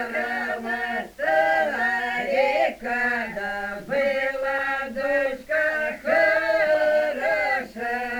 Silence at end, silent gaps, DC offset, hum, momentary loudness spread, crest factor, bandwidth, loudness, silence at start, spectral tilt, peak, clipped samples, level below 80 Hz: 0 s; none; under 0.1%; none; 7 LU; 16 dB; over 20 kHz; -23 LUFS; 0 s; -4 dB/octave; -8 dBFS; under 0.1%; -56 dBFS